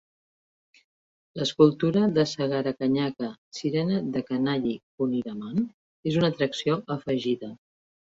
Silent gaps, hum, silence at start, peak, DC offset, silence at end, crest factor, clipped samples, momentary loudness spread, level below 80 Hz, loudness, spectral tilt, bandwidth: 3.38-3.51 s, 4.83-4.98 s, 5.74-6.03 s; none; 1.35 s; -4 dBFS; under 0.1%; 0.55 s; 22 dB; under 0.1%; 11 LU; -64 dBFS; -26 LUFS; -6.5 dB/octave; 7.8 kHz